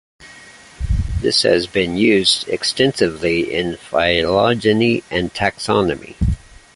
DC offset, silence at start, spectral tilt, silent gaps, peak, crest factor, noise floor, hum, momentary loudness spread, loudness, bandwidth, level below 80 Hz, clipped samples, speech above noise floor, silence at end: under 0.1%; 0.2 s; -4.5 dB/octave; none; 0 dBFS; 16 dB; -42 dBFS; none; 8 LU; -17 LUFS; 11.5 kHz; -30 dBFS; under 0.1%; 25 dB; 0.4 s